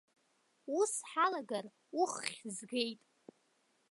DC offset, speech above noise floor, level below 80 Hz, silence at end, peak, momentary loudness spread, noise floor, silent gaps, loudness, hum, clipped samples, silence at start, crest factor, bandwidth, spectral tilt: under 0.1%; 39 dB; under -90 dBFS; 0.95 s; -16 dBFS; 11 LU; -76 dBFS; none; -37 LUFS; none; under 0.1%; 0.65 s; 22 dB; 11.5 kHz; -2 dB/octave